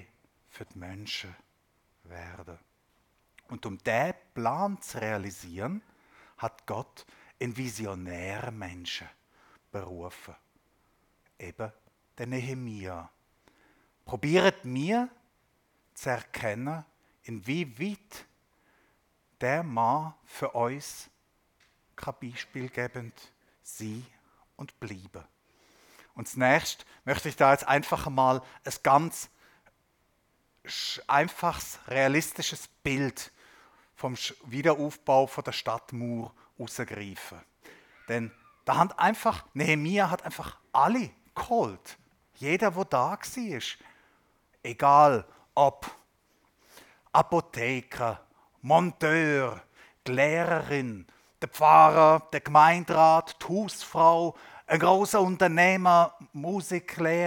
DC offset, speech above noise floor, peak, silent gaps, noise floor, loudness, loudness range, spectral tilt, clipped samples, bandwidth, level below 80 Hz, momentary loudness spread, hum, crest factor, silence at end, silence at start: under 0.1%; 44 dB; -4 dBFS; none; -71 dBFS; -27 LUFS; 18 LU; -5 dB/octave; under 0.1%; 18 kHz; -64 dBFS; 21 LU; none; 24 dB; 0 s; 0.55 s